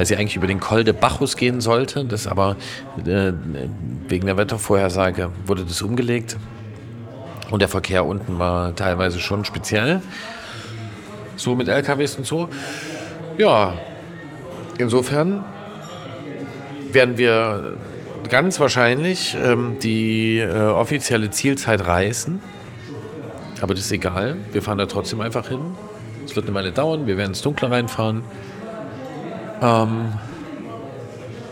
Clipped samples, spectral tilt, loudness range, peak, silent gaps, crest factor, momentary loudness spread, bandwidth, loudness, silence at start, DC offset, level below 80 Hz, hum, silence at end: under 0.1%; -5 dB/octave; 5 LU; -2 dBFS; none; 20 dB; 17 LU; 17.5 kHz; -20 LUFS; 0 s; under 0.1%; -46 dBFS; none; 0 s